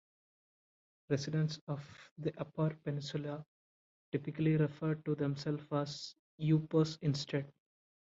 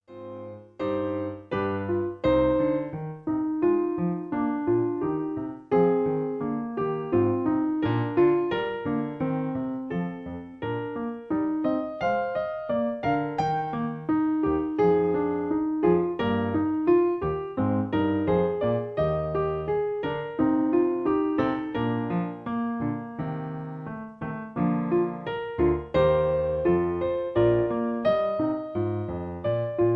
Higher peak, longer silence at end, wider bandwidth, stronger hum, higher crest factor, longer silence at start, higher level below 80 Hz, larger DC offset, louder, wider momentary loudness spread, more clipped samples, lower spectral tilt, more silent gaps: second, -20 dBFS vs -10 dBFS; first, 0.5 s vs 0 s; first, 7.6 kHz vs 6 kHz; neither; about the same, 18 dB vs 16 dB; first, 1.1 s vs 0.1 s; second, -74 dBFS vs -50 dBFS; neither; second, -37 LUFS vs -26 LUFS; about the same, 12 LU vs 10 LU; neither; second, -7 dB/octave vs -9.5 dB/octave; first, 1.61-1.67 s, 2.11-2.16 s, 3.48-4.12 s, 6.19-6.38 s vs none